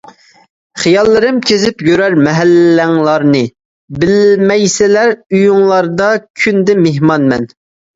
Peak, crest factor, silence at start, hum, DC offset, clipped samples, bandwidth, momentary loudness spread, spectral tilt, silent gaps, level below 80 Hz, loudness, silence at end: 0 dBFS; 10 dB; 0.75 s; none; under 0.1%; under 0.1%; 8 kHz; 6 LU; -5.5 dB/octave; 3.65-3.88 s, 5.26-5.30 s, 6.30-6.34 s; -46 dBFS; -10 LUFS; 0.5 s